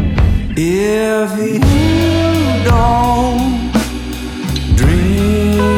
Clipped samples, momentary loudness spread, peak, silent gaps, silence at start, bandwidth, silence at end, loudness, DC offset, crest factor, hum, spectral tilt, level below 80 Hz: under 0.1%; 7 LU; 0 dBFS; none; 0 s; 17 kHz; 0 s; -14 LUFS; under 0.1%; 12 dB; none; -6.5 dB/octave; -20 dBFS